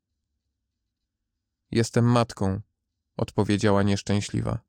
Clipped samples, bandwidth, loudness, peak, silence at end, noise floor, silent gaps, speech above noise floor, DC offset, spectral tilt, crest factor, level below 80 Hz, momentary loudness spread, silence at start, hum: under 0.1%; 11 kHz; -25 LUFS; -8 dBFS; 0.1 s; -82 dBFS; none; 59 dB; under 0.1%; -6.5 dB/octave; 18 dB; -52 dBFS; 9 LU; 1.7 s; none